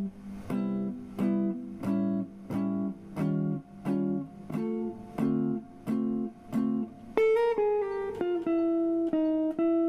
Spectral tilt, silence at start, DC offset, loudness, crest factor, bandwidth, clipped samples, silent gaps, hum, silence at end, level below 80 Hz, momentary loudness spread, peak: -9 dB/octave; 0 s; under 0.1%; -30 LUFS; 20 dB; 12 kHz; under 0.1%; none; none; 0 s; -62 dBFS; 9 LU; -10 dBFS